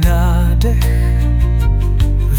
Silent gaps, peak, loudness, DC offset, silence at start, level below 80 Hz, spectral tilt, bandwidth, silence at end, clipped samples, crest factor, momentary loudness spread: none; -2 dBFS; -15 LUFS; 0.4%; 0 s; -12 dBFS; -7 dB/octave; 16.5 kHz; 0 s; under 0.1%; 10 dB; 2 LU